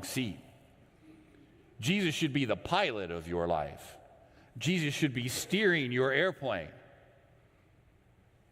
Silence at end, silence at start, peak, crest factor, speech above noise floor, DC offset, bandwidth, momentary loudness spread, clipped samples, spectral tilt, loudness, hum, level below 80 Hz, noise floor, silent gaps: 1.7 s; 0 s; -14 dBFS; 20 dB; 32 dB; under 0.1%; 16 kHz; 14 LU; under 0.1%; -4.5 dB/octave; -32 LUFS; none; -64 dBFS; -64 dBFS; none